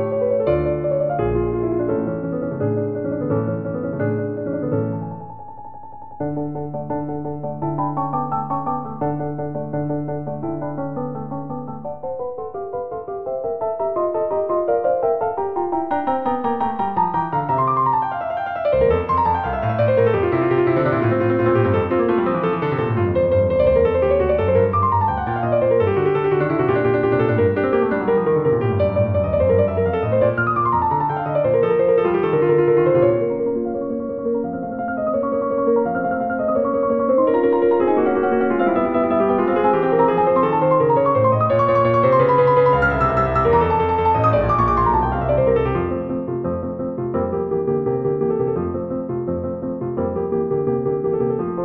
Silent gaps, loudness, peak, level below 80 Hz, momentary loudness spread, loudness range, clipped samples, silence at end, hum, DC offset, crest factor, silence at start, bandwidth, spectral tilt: none; -19 LUFS; -4 dBFS; -40 dBFS; 10 LU; 9 LU; under 0.1%; 0 s; none; under 0.1%; 16 dB; 0 s; 5.4 kHz; -10.5 dB/octave